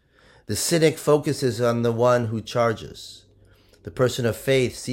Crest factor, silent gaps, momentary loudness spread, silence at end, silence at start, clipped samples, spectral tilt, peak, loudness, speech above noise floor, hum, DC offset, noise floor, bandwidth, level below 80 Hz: 18 dB; none; 18 LU; 0 s; 0.5 s; under 0.1%; -5 dB/octave; -6 dBFS; -22 LUFS; 33 dB; none; under 0.1%; -55 dBFS; 16.5 kHz; -54 dBFS